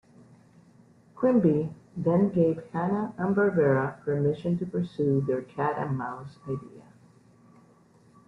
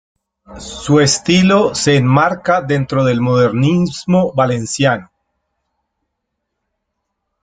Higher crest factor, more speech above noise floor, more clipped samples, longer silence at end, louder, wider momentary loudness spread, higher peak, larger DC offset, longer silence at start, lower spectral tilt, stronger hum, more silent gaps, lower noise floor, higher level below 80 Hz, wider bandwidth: about the same, 18 dB vs 14 dB; second, 32 dB vs 61 dB; neither; second, 1.45 s vs 2.4 s; second, -27 LUFS vs -14 LUFS; first, 13 LU vs 5 LU; second, -10 dBFS vs 0 dBFS; neither; first, 1.15 s vs 0.5 s; first, -10 dB/octave vs -5.5 dB/octave; neither; neither; second, -58 dBFS vs -74 dBFS; second, -64 dBFS vs -48 dBFS; second, 6 kHz vs 9.4 kHz